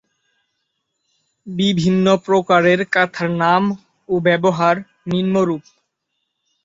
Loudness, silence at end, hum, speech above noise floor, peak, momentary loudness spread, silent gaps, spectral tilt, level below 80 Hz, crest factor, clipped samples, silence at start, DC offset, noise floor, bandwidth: -17 LUFS; 1.05 s; none; 58 dB; -2 dBFS; 9 LU; none; -6.5 dB/octave; -58 dBFS; 16 dB; under 0.1%; 1.45 s; under 0.1%; -74 dBFS; 7.8 kHz